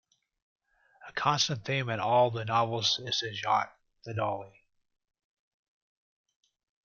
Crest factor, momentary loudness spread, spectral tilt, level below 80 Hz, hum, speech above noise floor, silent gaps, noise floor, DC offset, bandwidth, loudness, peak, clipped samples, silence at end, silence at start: 22 dB; 13 LU; -3.5 dB/octave; -72 dBFS; none; 26 dB; none; -56 dBFS; under 0.1%; 7.4 kHz; -29 LUFS; -12 dBFS; under 0.1%; 2.4 s; 1 s